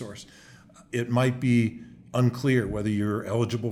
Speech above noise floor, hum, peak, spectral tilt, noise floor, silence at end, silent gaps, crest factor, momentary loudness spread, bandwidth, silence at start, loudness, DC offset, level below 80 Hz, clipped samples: 27 dB; none; -10 dBFS; -7 dB/octave; -52 dBFS; 0 s; none; 16 dB; 11 LU; 14 kHz; 0 s; -26 LUFS; under 0.1%; -54 dBFS; under 0.1%